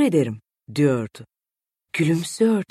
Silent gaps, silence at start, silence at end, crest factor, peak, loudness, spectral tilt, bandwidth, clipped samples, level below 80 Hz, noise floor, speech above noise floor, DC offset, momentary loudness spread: none; 0 s; 0.05 s; 16 dB; -6 dBFS; -22 LUFS; -6.5 dB/octave; 14 kHz; under 0.1%; -64 dBFS; -90 dBFS; 69 dB; under 0.1%; 12 LU